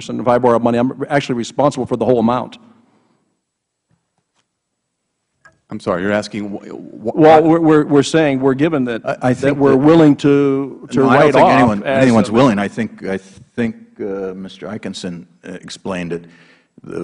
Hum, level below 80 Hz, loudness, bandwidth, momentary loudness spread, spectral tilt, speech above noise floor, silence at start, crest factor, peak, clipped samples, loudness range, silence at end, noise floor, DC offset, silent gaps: none; -50 dBFS; -14 LUFS; 11 kHz; 19 LU; -6.5 dB/octave; 60 dB; 0 s; 16 dB; 0 dBFS; under 0.1%; 14 LU; 0 s; -74 dBFS; under 0.1%; none